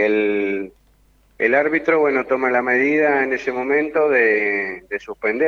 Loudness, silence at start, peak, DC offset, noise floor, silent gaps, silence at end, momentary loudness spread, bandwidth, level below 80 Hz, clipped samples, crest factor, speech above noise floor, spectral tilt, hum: -18 LUFS; 0 s; -2 dBFS; under 0.1%; -56 dBFS; none; 0 s; 9 LU; 7 kHz; -58 dBFS; under 0.1%; 16 dB; 38 dB; -6.5 dB/octave; none